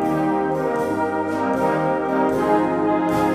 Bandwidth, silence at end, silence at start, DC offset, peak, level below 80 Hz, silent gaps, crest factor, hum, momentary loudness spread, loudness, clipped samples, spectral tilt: 15.5 kHz; 0 s; 0 s; under 0.1%; -6 dBFS; -50 dBFS; none; 14 dB; none; 3 LU; -20 LUFS; under 0.1%; -7 dB/octave